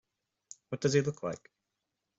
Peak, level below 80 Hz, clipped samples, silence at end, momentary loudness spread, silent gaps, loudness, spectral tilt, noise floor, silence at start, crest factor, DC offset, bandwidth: -14 dBFS; -70 dBFS; under 0.1%; 0.8 s; 23 LU; none; -32 LUFS; -5.5 dB/octave; -86 dBFS; 0.7 s; 22 dB; under 0.1%; 8 kHz